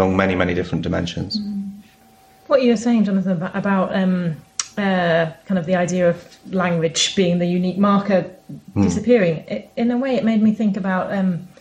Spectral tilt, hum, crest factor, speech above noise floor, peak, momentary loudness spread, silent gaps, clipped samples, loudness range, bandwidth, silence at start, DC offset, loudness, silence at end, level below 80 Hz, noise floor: -5.5 dB/octave; none; 18 dB; 32 dB; -2 dBFS; 10 LU; none; under 0.1%; 2 LU; 9.8 kHz; 0 s; under 0.1%; -19 LUFS; 0.15 s; -50 dBFS; -51 dBFS